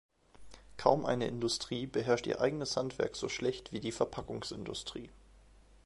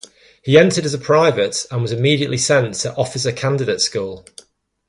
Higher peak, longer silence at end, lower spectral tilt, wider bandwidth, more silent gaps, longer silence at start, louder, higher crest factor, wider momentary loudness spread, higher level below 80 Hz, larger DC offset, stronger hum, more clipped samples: second, -10 dBFS vs 0 dBFS; second, 0.5 s vs 0.7 s; about the same, -4.5 dB/octave vs -4.5 dB/octave; about the same, 11.5 kHz vs 11.5 kHz; neither; about the same, 0.35 s vs 0.45 s; second, -35 LUFS vs -17 LUFS; first, 26 dB vs 18 dB; about the same, 11 LU vs 9 LU; second, -60 dBFS vs -54 dBFS; neither; neither; neither